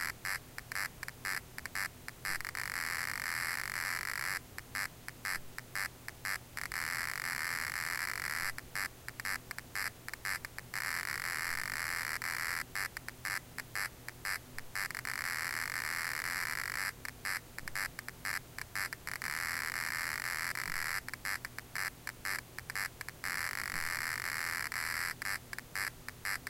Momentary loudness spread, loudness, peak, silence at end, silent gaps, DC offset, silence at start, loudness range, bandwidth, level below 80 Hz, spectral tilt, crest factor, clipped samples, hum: 6 LU; -37 LUFS; -18 dBFS; 0 s; none; under 0.1%; 0 s; 2 LU; 17 kHz; -60 dBFS; -1 dB/octave; 22 dB; under 0.1%; none